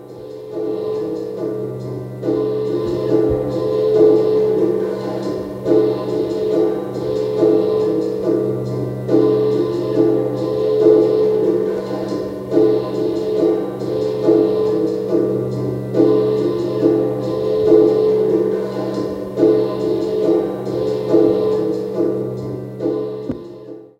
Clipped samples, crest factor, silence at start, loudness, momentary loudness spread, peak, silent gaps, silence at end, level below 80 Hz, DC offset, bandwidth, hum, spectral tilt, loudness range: under 0.1%; 16 dB; 0 s; -18 LUFS; 10 LU; -2 dBFS; none; 0.15 s; -50 dBFS; under 0.1%; 8.4 kHz; none; -8.5 dB/octave; 3 LU